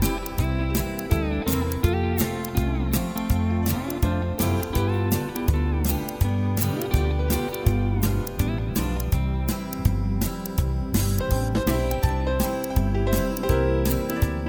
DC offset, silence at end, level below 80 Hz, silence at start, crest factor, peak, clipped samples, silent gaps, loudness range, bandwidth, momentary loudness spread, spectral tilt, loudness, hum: under 0.1%; 0 s; -28 dBFS; 0 s; 16 dB; -6 dBFS; under 0.1%; none; 1 LU; over 20 kHz; 3 LU; -6 dB/octave; -25 LUFS; none